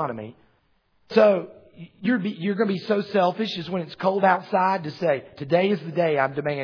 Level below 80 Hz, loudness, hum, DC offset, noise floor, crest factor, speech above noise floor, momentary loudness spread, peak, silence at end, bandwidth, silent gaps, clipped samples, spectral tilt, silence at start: -70 dBFS; -23 LUFS; none; under 0.1%; -65 dBFS; 20 dB; 42 dB; 10 LU; -4 dBFS; 0 s; 5.4 kHz; none; under 0.1%; -7.5 dB/octave; 0 s